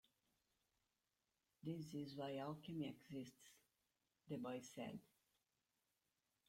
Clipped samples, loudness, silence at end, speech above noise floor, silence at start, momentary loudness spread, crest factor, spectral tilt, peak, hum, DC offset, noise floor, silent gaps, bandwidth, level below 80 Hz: under 0.1%; -52 LUFS; 1.45 s; over 39 dB; 1.65 s; 10 LU; 18 dB; -6 dB/octave; -36 dBFS; none; under 0.1%; under -90 dBFS; none; 16.5 kHz; -86 dBFS